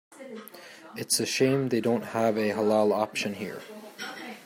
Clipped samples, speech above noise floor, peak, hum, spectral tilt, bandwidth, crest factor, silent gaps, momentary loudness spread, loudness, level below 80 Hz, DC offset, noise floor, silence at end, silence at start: under 0.1%; 21 dB; -10 dBFS; none; -4 dB/octave; 16 kHz; 18 dB; none; 19 LU; -27 LUFS; -74 dBFS; under 0.1%; -47 dBFS; 0 s; 0.1 s